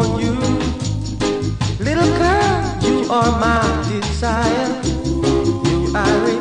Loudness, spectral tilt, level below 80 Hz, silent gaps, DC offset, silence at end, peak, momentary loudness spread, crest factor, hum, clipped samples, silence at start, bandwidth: -17 LUFS; -5.5 dB/octave; -28 dBFS; none; under 0.1%; 0 s; -2 dBFS; 6 LU; 14 dB; none; under 0.1%; 0 s; 10.5 kHz